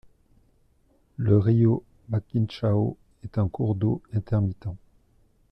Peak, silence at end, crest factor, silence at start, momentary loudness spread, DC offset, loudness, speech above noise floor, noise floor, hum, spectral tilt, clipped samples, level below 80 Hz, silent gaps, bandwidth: -8 dBFS; 0.75 s; 18 dB; 1.2 s; 16 LU; under 0.1%; -25 LUFS; 40 dB; -63 dBFS; none; -10.5 dB/octave; under 0.1%; -52 dBFS; none; 5.6 kHz